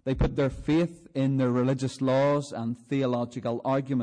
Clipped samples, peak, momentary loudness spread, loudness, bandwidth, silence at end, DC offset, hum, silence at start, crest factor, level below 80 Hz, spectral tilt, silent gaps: under 0.1%; -16 dBFS; 6 LU; -27 LUFS; 10 kHz; 0 s; under 0.1%; none; 0.05 s; 10 dB; -42 dBFS; -7.5 dB/octave; none